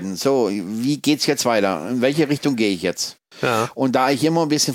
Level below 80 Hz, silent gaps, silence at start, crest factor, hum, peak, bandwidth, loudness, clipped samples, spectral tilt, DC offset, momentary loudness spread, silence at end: -64 dBFS; none; 0 s; 16 dB; none; -4 dBFS; 17 kHz; -20 LUFS; under 0.1%; -4 dB/octave; under 0.1%; 5 LU; 0 s